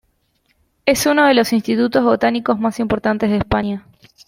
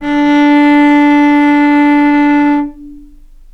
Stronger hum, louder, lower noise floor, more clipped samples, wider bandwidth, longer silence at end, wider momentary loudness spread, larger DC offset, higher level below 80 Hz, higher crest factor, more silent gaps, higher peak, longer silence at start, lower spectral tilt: neither; second, -16 LUFS vs -8 LUFS; first, -63 dBFS vs -36 dBFS; neither; first, 16.5 kHz vs 6.2 kHz; about the same, 0.45 s vs 0.55 s; first, 7 LU vs 4 LU; neither; about the same, -42 dBFS vs -38 dBFS; first, 16 dB vs 8 dB; neither; about the same, 0 dBFS vs 0 dBFS; first, 0.85 s vs 0 s; about the same, -4.5 dB/octave vs -5 dB/octave